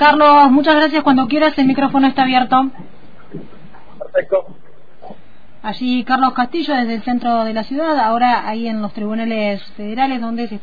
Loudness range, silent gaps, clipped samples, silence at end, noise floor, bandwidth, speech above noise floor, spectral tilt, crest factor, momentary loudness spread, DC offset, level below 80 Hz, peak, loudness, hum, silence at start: 8 LU; none; under 0.1%; 0.05 s; -46 dBFS; 5 kHz; 31 dB; -7 dB/octave; 16 dB; 13 LU; 4%; -50 dBFS; 0 dBFS; -15 LUFS; none; 0 s